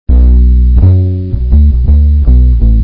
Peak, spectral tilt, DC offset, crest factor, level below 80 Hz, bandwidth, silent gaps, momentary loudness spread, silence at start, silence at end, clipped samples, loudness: 0 dBFS; -14 dB/octave; under 0.1%; 6 dB; -6 dBFS; 1.3 kHz; none; 4 LU; 0.1 s; 0 s; 2%; -8 LUFS